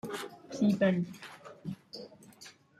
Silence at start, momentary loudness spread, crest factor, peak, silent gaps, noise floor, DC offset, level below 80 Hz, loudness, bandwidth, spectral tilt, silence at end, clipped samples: 0.05 s; 24 LU; 20 dB; -16 dBFS; none; -55 dBFS; under 0.1%; -74 dBFS; -32 LUFS; 14 kHz; -6.5 dB/octave; 0.3 s; under 0.1%